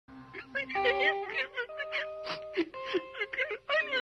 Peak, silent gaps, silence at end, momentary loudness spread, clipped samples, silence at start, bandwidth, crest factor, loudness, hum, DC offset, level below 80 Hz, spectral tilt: -16 dBFS; none; 0 s; 10 LU; under 0.1%; 0.1 s; 10.5 kHz; 18 dB; -32 LUFS; none; under 0.1%; -68 dBFS; -4 dB/octave